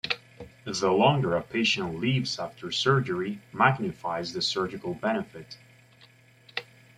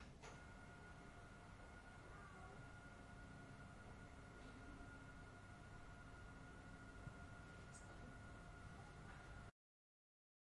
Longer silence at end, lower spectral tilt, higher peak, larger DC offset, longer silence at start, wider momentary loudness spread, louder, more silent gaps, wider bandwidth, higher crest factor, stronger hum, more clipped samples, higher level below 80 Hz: second, 0.35 s vs 1 s; about the same, -5 dB/octave vs -5.5 dB/octave; first, -6 dBFS vs -44 dBFS; neither; about the same, 0.05 s vs 0 s; first, 15 LU vs 2 LU; first, -27 LUFS vs -60 LUFS; neither; about the same, 12 kHz vs 11 kHz; first, 24 dB vs 16 dB; neither; neither; about the same, -62 dBFS vs -66 dBFS